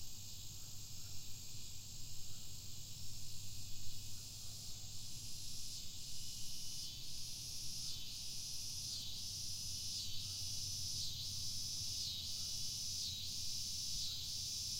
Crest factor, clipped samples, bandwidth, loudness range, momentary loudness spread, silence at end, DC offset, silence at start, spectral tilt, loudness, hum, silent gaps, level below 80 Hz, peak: 14 dB; under 0.1%; 16 kHz; 9 LU; 9 LU; 0 s; under 0.1%; 0 s; -0.5 dB/octave; -44 LUFS; none; none; -58 dBFS; -28 dBFS